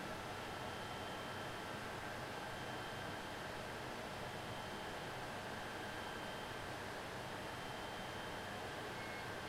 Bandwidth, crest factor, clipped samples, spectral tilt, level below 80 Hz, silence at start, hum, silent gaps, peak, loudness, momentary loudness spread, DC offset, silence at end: 16.5 kHz; 12 dB; under 0.1%; -4 dB/octave; -64 dBFS; 0 s; none; none; -34 dBFS; -46 LUFS; 1 LU; under 0.1%; 0 s